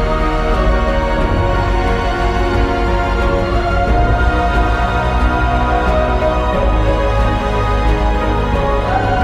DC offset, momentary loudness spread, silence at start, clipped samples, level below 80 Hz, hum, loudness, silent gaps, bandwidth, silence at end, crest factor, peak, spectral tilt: under 0.1%; 2 LU; 0 s; under 0.1%; -16 dBFS; none; -15 LUFS; none; 9.2 kHz; 0 s; 12 dB; -2 dBFS; -7 dB/octave